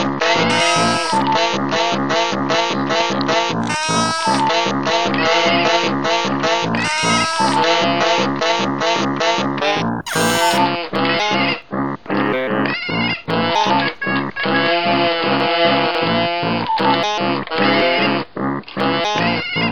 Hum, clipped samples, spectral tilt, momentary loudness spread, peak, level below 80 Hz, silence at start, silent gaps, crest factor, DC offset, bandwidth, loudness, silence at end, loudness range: none; under 0.1%; -4 dB/octave; 5 LU; -2 dBFS; -48 dBFS; 0 s; none; 16 dB; 0.9%; 18.5 kHz; -17 LUFS; 0 s; 2 LU